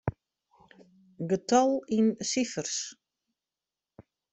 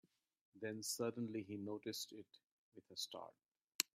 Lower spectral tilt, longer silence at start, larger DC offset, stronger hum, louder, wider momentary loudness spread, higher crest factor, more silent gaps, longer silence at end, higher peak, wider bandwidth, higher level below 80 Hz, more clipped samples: first, -4.5 dB/octave vs -3 dB/octave; second, 0.05 s vs 0.55 s; neither; neither; first, -28 LUFS vs -47 LUFS; second, 13 LU vs 22 LU; second, 22 dB vs 34 dB; second, none vs 2.51-2.72 s, 3.75-3.79 s; first, 0.3 s vs 0.15 s; first, -10 dBFS vs -14 dBFS; second, 8.2 kHz vs 16 kHz; first, -62 dBFS vs under -90 dBFS; neither